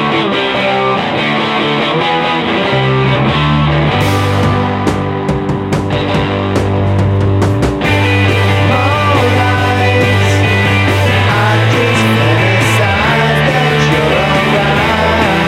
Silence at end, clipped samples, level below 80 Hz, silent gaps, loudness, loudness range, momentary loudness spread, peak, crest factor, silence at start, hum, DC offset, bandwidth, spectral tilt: 0 s; under 0.1%; -30 dBFS; none; -11 LUFS; 3 LU; 4 LU; 0 dBFS; 10 dB; 0 s; none; under 0.1%; 15 kHz; -6 dB/octave